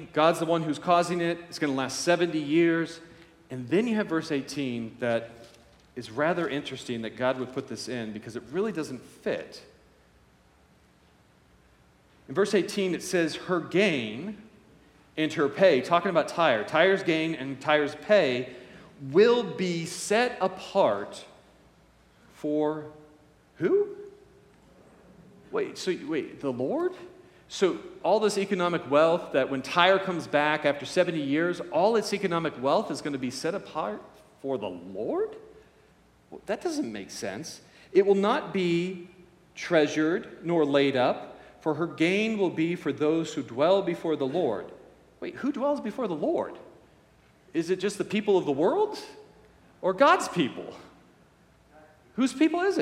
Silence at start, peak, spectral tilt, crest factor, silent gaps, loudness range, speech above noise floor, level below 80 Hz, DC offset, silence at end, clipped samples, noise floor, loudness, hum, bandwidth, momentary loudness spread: 0 s; -4 dBFS; -5 dB/octave; 22 dB; none; 9 LU; 34 dB; -68 dBFS; under 0.1%; 0 s; under 0.1%; -60 dBFS; -27 LUFS; none; 14.5 kHz; 15 LU